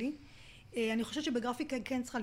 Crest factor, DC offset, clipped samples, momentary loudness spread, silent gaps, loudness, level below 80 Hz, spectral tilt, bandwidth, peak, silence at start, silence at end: 14 dB; under 0.1%; under 0.1%; 17 LU; none; -36 LUFS; -64 dBFS; -4 dB/octave; 16 kHz; -24 dBFS; 0 s; 0 s